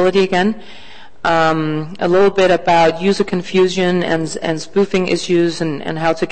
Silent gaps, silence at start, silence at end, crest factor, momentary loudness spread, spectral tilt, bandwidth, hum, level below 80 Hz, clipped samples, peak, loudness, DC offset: none; 0 s; 0 s; 12 dB; 8 LU; -5.5 dB/octave; 8.8 kHz; none; -46 dBFS; under 0.1%; -4 dBFS; -15 LUFS; 3%